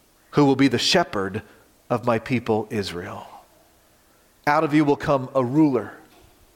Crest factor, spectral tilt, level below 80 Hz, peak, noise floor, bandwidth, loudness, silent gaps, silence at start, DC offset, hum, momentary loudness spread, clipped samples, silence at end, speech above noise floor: 18 dB; -5.5 dB/octave; -56 dBFS; -6 dBFS; -58 dBFS; 16.5 kHz; -21 LUFS; none; 0.35 s; under 0.1%; none; 13 LU; under 0.1%; 0.6 s; 37 dB